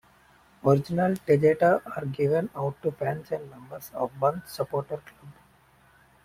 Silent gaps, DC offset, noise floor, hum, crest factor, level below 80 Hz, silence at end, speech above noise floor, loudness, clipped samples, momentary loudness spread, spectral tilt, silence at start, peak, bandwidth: none; under 0.1%; -59 dBFS; none; 20 dB; -62 dBFS; 0.95 s; 33 dB; -26 LUFS; under 0.1%; 14 LU; -7.5 dB/octave; 0.65 s; -8 dBFS; 16.5 kHz